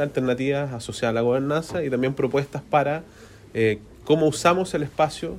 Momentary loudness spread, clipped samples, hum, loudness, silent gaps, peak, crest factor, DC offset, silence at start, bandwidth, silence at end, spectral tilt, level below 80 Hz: 6 LU; under 0.1%; none; -23 LUFS; none; -4 dBFS; 18 dB; under 0.1%; 0 s; 15.5 kHz; 0 s; -6 dB/octave; -52 dBFS